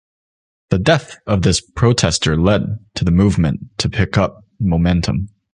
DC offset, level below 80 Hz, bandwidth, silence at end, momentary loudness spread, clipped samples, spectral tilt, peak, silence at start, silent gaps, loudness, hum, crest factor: under 0.1%; -30 dBFS; 11 kHz; 0.25 s; 7 LU; under 0.1%; -5.5 dB/octave; -2 dBFS; 0.7 s; none; -17 LUFS; none; 16 dB